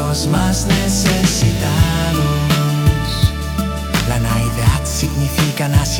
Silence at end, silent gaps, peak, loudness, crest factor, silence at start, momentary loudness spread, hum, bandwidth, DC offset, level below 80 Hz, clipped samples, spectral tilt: 0 s; none; -2 dBFS; -16 LUFS; 14 dB; 0 s; 4 LU; none; 18 kHz; under 0.1%; -24 dBFS; under 0.1%; -5 dB/octave